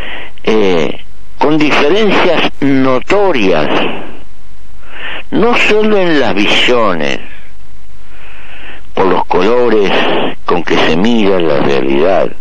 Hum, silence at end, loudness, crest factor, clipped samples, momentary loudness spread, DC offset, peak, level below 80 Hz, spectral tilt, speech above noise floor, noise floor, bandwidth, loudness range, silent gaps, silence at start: none; 0.1 s; -11 LUFS; 8 dB; under 0.1%; 13 LU; 30%; 0 dBFS; -38 dBFS; -5.5 dB/octave; 27 dB; -38 dBFS; 10 kHz; 3 LU; none; 0 s